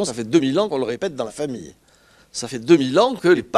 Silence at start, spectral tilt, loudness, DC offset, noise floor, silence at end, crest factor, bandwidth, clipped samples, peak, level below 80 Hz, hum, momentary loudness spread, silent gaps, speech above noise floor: 0 s; -5 dB/octave; -20 LUFS; under 0.1%; -54 dBFS; 0 s; 18 dB; 12 kHz; under 0.1%; -2 dBFS; -58 dBFS; none; 13 LU; none; 35 dB